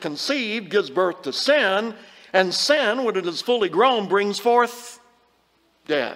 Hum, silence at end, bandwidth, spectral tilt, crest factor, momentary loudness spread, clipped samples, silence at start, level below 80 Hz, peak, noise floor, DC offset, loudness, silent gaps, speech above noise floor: none; 0 s; 16 kHz; -3 dB/octave; 20 dB; 7 LU; under 0.1%; 0 s; -74 dBFS; -2 dBFS; -63 dBFS; under 0.1%; -21 LUFS; none; 42 dB